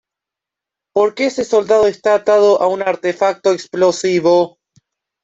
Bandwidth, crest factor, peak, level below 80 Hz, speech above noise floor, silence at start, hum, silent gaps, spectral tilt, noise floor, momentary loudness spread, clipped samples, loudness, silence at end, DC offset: 8 kHz; 14 dB; -2 dBFS; -58 dBFS; 71 dB; 0.95 s; none; none; -4.5 dB/octave; -85 dBFS; 6 LU; under 0.1%; -15 LUFS; 0.75 s; under 0.1%